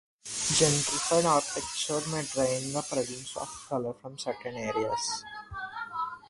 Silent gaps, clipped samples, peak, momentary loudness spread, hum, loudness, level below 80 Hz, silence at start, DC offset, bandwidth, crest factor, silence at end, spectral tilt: none; under 0.1%; -10 dBFS; 13 LU; none; -30 LUFS; -60 dBFS; 0.25 s; under 0.1%; 11.5 kHz; 20 dB; 0 s; -3 dB/octave